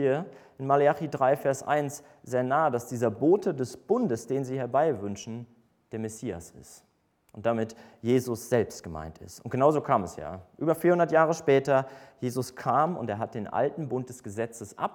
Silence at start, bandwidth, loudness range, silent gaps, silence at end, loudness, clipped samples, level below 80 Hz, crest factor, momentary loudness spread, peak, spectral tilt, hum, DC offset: 0 s; 19 kHz; 7 LU; none; 0 s; -28 LUFS; under 0.1%; -62 dBFS; 20 dB; 16 LU; -8 dBFS; -6.5 dB/octave; none; under 0.1%